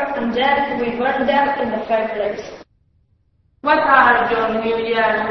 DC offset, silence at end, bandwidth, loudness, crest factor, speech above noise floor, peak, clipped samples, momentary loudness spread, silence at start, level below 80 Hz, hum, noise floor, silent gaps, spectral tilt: under 0.1%; 0 s; 6.2 kHz; -17 LUFS; 18 dB; 43 dB; 0 dBFS; under 0.1%; 11 LU; 0 s; -48 dBFS; none; -60 dBFS; none; -5.5 dB/octave